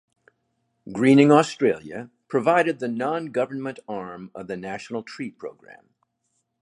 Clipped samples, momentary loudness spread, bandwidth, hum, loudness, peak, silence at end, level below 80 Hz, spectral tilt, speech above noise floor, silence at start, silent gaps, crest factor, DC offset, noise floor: under 0.1%; 21 LU; 11.5 kHz; none; -22 LUFS; -2 dBFS; 0.9 s; -68 dBFS; -6.5 dB/octave; 52 dB; 0.85 s; none; 22 dB; under 0.1%; -74 dBFS